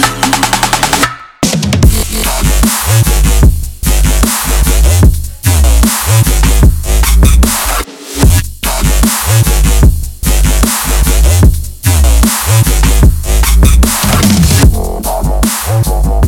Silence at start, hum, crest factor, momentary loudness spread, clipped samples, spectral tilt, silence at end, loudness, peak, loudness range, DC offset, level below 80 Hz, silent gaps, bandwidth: 0 s; none; 8 dB; 6 LU; 0.7%; -4 dB/octave; 0 s; -10 LUFS; 0 dBFS; 1 LU; under 0.1%; -10 dBFS; none; 18.5 kHz